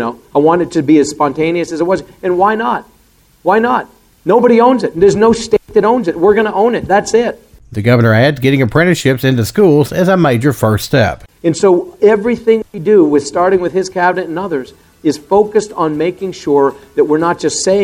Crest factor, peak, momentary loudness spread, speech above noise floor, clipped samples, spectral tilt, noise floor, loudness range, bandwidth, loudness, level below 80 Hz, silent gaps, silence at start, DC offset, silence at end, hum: 12 dB; 0 dBFS; 8 LU; 38 dB; under 0.1%; -6 dB/octave; -49 dBFS; 4 LU; 18 kHz; -12 LUFS; -44 dBFS; none; 0 s; under 0.1%; 0 s; none